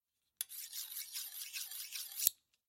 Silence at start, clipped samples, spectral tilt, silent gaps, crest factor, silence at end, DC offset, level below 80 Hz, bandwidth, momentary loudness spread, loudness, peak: 0.4 s; under 0.1%; 5 dB/octave; none; 36 dB; 0.35 s; under 0.1%; under -90 dBFS; 16.5 kHz; 10 LU; -40 LUFS; -6 dBFS